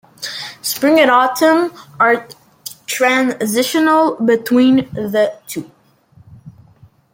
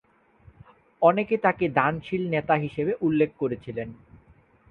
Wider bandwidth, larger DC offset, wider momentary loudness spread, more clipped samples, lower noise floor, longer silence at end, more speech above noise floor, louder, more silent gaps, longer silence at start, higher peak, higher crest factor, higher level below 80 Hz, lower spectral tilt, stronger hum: first, 17 kHz vs 4.9 kHz; neither; first, 15 LU vs 11 LU; neither; second, -49 dBFS vs -57 dBFS; about the same, 0.65 s vs 0.75 s; about the same, 35 dB vs 33 dB; first, -14 LUFS vs -25 LUFS; neither; second, 0.2 s vs 1 s; about the same, -2 dBFS vs -4 dBFS; second, 14 dB vs 22 dB; about the same, -60 dBFS vs -58 dBFS; second, -3.5 dB/octave vs -9.5 dB/octave; neither